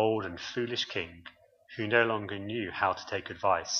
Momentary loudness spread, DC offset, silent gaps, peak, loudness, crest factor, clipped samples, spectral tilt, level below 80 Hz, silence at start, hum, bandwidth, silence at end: 11 LU; under 0.1%; none; -10 dBFS; -31 LUFS; 22 dB; under 0.1%; -3.5 dB/octave; -66 dBFS; 0 s; none; 7.2 kHz; 0 s